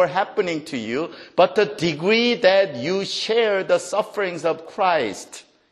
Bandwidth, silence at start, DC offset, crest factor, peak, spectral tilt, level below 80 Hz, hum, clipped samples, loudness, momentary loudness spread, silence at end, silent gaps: 12.5 kHz; 0 s; under 0.1%; 18 dB; -2 dBFS; -4 dB/octave; -66 dBFS; none; under 0.1%; -21 LUFS; 10 LU; 0.3 s; none